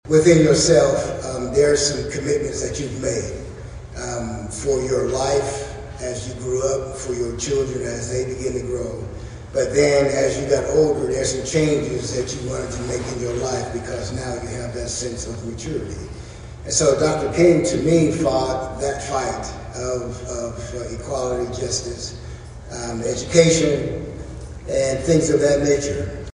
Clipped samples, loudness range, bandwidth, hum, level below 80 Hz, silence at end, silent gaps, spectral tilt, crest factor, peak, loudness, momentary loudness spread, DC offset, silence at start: under 0.1%; 7 LU; 10.5 kHz; none; -38 dBFS; 0.05 s; none; -4.5 dB/octave; 20 dB; 0 dBFS; -21 LUFS; 15 LU; under 0.1%; 0.05 s